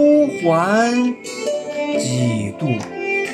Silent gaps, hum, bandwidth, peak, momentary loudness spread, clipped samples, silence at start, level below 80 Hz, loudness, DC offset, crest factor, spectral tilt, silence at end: none; none; 13.5 kHz; -4 dBFS; 8 LU; under 0.1%; 0 s; -64 dBFS; -19 LUFS; under 0.1%; 14 dB; -5.5 dB/octave; 0 s